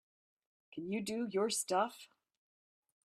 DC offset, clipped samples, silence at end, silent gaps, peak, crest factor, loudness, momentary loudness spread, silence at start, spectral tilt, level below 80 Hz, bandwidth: under 0.1%; under 0.1%; 1 s; none; -20 dBFS; 20 dB; -36 LUFS; 16 LU; 0.75 s; -3.5 dB/octave; -82 dBFS; 15 kHz